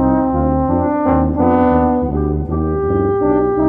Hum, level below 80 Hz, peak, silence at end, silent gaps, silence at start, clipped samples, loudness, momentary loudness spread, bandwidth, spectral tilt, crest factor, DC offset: none; -26 dBFS; 0 dBFS; 0 s; none; 0 s; under 0.1%; -15 LUFS; 5 LU; 3.5 kHz; -12.5 dB/octave; 14 dB; under 0.1%